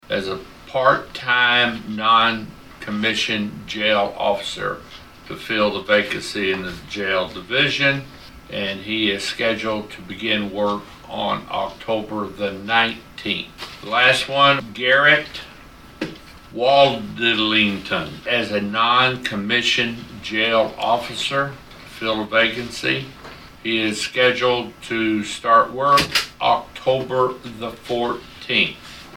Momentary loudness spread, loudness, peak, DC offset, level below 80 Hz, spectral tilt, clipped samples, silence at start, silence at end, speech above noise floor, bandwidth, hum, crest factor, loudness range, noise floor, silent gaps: 16 LU; -19 LUFS; -2 dBFS; under 0.1%; -50 dBFS; -3.5 dB/octave; under 0.1%; 0.1 s; 0 s; 22 dB; 17 kHz; none; 20 dB; 5 LU; -43 dBFS; none